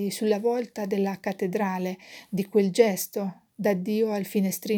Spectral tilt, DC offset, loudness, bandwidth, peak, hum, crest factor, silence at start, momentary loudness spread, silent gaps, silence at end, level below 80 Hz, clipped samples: -5.5 dB/octave; under 0.1%; -27 LUFS; over 20 kHz; -6 dBFS; none; 20 dB; 0 s; 10 LU; none; 0 s; -76 dBFS; under 0.1%